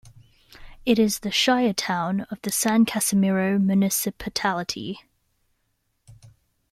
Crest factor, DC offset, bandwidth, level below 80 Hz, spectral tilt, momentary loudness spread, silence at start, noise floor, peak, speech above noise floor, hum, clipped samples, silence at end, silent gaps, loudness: 18 dB; under 0.1%; 15.5 kHz; -54 dBFS; -4 dB/octave; 9 LU; 0.05 s; -72 dBFS; -8 dBFS; 50 dB; none; under 0.1%; 0.45 s; none; -22 LUFS